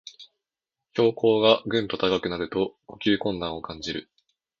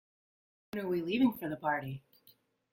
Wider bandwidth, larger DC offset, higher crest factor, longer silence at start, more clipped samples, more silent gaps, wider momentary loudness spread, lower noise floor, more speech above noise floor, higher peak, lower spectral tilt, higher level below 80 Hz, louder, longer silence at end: second, 7.4 kHz vs 16.5 kHz; neither; about the same, 22 dB vs 20 dB; second, 0.05 s vs 0.75 s; neither; neither; about the same, 13 LU vs 14 LU; first, -88 dBFS vs -67 dBFS; first, 63 dB vs 34 dB; first, -4 dBFS vs -16 dBFS; second, -5.5 dB/octave vs -7 dB/octave; first, -56 dBFS vs -70 dBFS; first, -25 LUFS vs -34 LUFS; second, 0.6 s vs 0.75 s